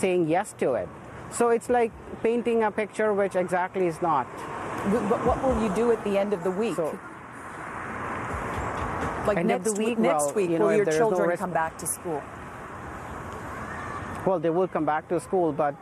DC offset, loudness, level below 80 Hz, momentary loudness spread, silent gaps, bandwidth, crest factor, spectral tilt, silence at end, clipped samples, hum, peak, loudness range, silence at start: under 0.1%; -26 LUFS; -48 dBFS; 13 LU; none; 13.5 kHz; 16 dB; -5.5 dB/octave; 0 s; under 0.1%; none; -10 dBFS; 5 LU; 0 s